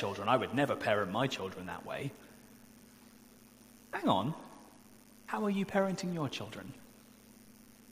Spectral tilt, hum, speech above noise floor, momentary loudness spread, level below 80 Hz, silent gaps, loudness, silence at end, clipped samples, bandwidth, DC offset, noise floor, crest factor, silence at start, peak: -5.5 dB/octave; none; 24 dB; 23 LU; -70 dBFS; none; -34 LUFS; 0 s; under 0.1%; 15.5 kHz; under 0.1%; -58 dBFS; 24 dB; 0 s; -12 dBFS